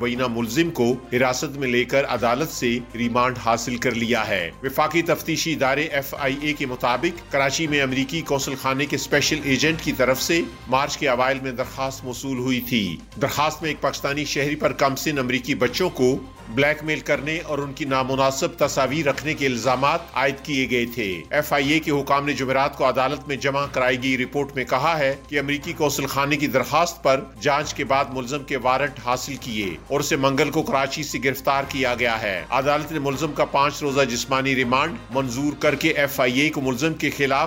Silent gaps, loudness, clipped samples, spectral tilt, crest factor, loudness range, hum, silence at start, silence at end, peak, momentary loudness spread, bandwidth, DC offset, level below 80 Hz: none; -22 LUFS; under 0.1%; -4 dB/octave; 16 dB; 2 LU; none; 0 s; 0 s; -6 dBFS; 5 LU; 16.5 kHz; under 0.1%; -46 dBFS